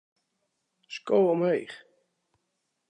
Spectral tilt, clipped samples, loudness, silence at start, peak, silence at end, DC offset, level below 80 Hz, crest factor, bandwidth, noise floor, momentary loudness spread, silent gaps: -7 dB/octave; under 0.1%; -25 LUFS; 0.9 s; -12 dBFS; 1.1 s; under 0.1%; -84 dBFS; 18 dB; 9.4 kHz; -79 dBFS; 21 LU; none